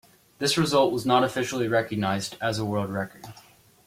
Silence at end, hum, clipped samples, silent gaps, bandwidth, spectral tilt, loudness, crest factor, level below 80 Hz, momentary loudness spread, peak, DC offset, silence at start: 0.45 s; none; under 0.1%; none; 16.5 kHz; -4.5 dB/octave; -25 LUFS; 18 dB; -60 dBFS; 11 LU; -8 dBFS; under 0.1%; 0.4 s